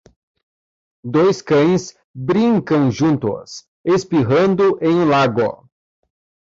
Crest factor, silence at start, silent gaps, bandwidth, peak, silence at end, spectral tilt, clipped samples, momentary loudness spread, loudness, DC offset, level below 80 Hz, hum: 12 dB; 1.05 s; 2.04-2.14 s, 3.68-3.84 s; 7.8 kHz; -4 dBFS; 0.95 s; -7 dB/octave; under 0.1%; 12 LU; -16 LUFS; under 0.1%; -54 dBFS; none